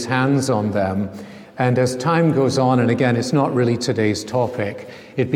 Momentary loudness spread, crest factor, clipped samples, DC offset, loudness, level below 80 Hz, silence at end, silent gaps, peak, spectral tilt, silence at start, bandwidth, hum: 11 LU; 16 dB; under 0.1%; under 0.1%; -19 LUFS; -58 dBFS; 0 s; none; -2 dBFS; -6 dB/octave; 0 s; 14 kHz; none